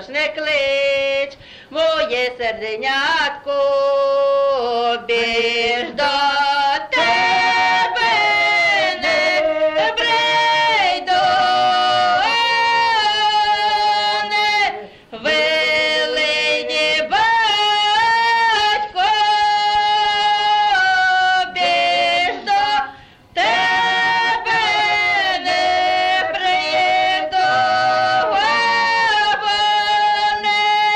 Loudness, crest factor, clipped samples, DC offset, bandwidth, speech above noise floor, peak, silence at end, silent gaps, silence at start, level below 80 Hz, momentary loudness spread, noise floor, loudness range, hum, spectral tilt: -16 LUFS; 10 dB; under 0.1%; under 0.1%; 12 kHz; 21 dB; -8 dBFS; 0 s; none; 0 s; -52 dBFS; 4 LU; -39 dBFS; 2 LU; none; -1.5 dB/octave